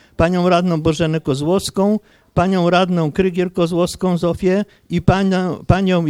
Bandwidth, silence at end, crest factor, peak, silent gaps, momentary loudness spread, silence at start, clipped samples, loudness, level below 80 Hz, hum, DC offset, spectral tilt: 14.5 kHz; 0 s; 16 dB; 0 dBFS; none; 5 LU; 0.2 s; under 0.1%; -17 LUFS; -36 dBFS; none; under 0.1%; -6.5 dB/octave